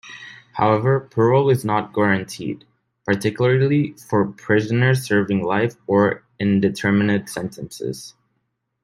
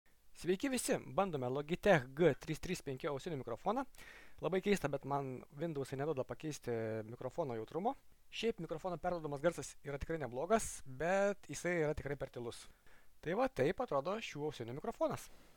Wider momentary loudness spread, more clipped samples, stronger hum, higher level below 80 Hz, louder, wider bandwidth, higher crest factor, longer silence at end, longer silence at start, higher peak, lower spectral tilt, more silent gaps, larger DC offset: about the same, 13 LU vs 11 LU; neither; neither; about the same, -58 dBFS vs -60 dBFS; first, -20 LUFS vs -39 LUFS; second, 15.5 kHz vs 19 kHz; about the same, 16 dB vs 20 dB; first, 0.75 s vs 0.05 s; second, 0.05 s vs 0.25 s; first, -2 dBFS vs -18 dBFS; first, -7 dB/octave vs -5 dB/octave; neither; neither